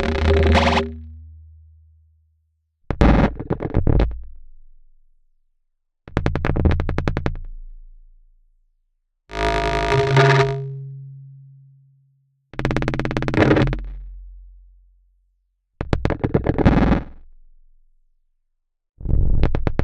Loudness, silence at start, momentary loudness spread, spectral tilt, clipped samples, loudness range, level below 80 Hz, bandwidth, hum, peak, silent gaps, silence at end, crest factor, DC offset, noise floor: -20 LUFS; 0 s; 21 LU; -7 dB/octave; under 0.1%; 5 LU; -28 dBFS; 9.8 kHz; none; 0 dBFS; none; 0 s; 22 dB; under 0.1%; -71 dBFS